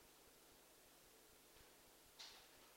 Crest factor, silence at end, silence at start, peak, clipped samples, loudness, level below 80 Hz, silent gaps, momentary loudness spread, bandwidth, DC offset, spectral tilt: 22 dB; 0 s; 0 s; -44 dBFS; under 0.1%; -64 LUFS; -82 dBFS; none; 8 LU; 16 kHz; under 0.1%; -1 dB/octave